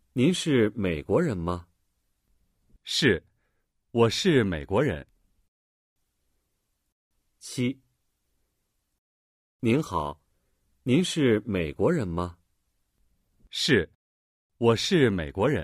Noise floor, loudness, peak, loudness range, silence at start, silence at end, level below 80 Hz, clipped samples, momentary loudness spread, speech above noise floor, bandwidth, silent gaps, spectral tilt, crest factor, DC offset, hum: -77 dBFS; -26 LUFS; -8 dBFS; 12 LU; 0.15 s; 0 s; -52 dBFS; under 0.1%; 14 LU; 52 dB; 15.5 kHz; 5.48-5.96 s, 6.92-7.11 s, 8.98-9.59 s, 13.95-14.50 s; -5.5 dB/octave; 20 dB; under 0.1%; none